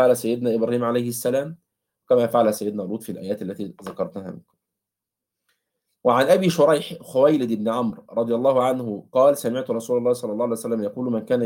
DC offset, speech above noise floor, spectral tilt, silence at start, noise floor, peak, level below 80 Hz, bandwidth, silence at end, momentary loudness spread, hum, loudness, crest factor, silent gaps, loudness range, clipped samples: under 0.1%; 65 dB; -6 dB/octave; 0 s; -86 dBFS; -4 dBFS; -68 dBFS; 17 kHz; 0 s; 12 LU; none; -22 LUFS; 18 dB; none; 8 LU; under 0.1%